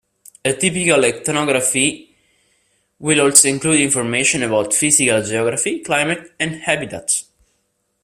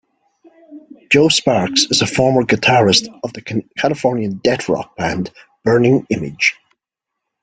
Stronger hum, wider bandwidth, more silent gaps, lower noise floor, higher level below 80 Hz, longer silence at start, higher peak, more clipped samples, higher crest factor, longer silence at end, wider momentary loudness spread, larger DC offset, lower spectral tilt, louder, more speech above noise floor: neither; first, 15.5 kHz vs 9.6 kHz; neither; second, -68 dBFS vs -81 dBFS; second, -56 dBFS vs -50 dBFS; second, 0.45 s vs 0.7 s; about the same, 0 dBFS vs 0 dBFS; neither; about the same, 18 dB vs 16 dB; about the same, 0.8 s vs 0.9 s; about the same, 11 LU vs 11 LU; neither; second, -2.5 dB/octave vs -4 dB/octave; about the same, -16 LUFS vs -15 LUFS; second, 51 dB vs 66 dB